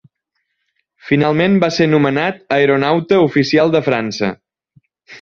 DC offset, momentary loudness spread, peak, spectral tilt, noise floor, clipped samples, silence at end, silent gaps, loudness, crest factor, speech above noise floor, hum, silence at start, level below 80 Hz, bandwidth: under 0.1%; 6 LU; -2 dBFS; -6.5 dB/octave; -72 dBFS; under 0.1%; 0.05 s; none; -14 LUFS; 14 dB; 58 dB; none; 1.05 s; -54 dBFS; 7.4 kHz